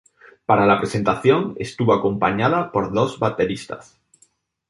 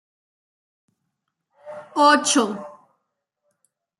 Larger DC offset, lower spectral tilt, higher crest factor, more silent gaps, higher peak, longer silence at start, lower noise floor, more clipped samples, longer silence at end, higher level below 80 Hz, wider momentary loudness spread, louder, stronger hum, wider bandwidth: neither; first, -6.5 dB/octave vs -1.5 dB/octave; about the same, 18 dB vs 20 dB; neither; about the same, -2 dBFS vs -4 dBFS; second, 0.5 s vs 1.65 s; second, -61 dBFS vs -78 dBFS; neither; second, 0.85 s vs 1.3 s; first, -52 dBFS vs -80 dBFS; second, 12 LU vs 24 LU; about the same, -20 LUFS vs -18 LUFS; neither; about the same, 11.5 kHz vs 12 kHz